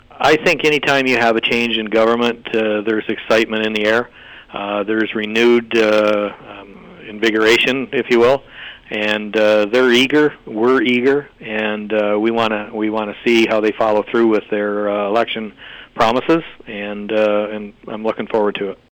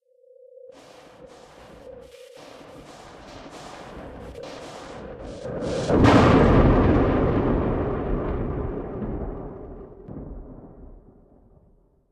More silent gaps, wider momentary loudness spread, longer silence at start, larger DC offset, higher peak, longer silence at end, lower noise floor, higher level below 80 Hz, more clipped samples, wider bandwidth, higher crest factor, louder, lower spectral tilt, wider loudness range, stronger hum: neither; second, 12 LU vs 27 LU; second, 0.15 s vs 0.65 s; neither; about the same, -4 dBFS vs -4 dBFS; second, 0.15 s vs 1.15 s; second, -37 dBFS vs -59 dBFS; second, -52 dBFS vs -34 dBFS; neither; first, 19 kHz vs 11 kHz; second, 12 dB vs 20 dB; first, -16 LUFS vs -21 LUFS; second, -4.5 dB/octave vs -7.5 dB/octave; second, 4 LU vs 22 LU; neither